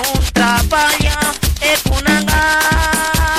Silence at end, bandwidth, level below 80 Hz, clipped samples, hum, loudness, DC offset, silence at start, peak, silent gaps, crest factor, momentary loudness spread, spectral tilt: 0 s; 16.5 kHz; -20 dBFS; under 0.1%; none; -13 LUFS; under 0.1%; 0 s; -2 dBFS; none; 12 dB; 3 LU; -3.5 dB/octave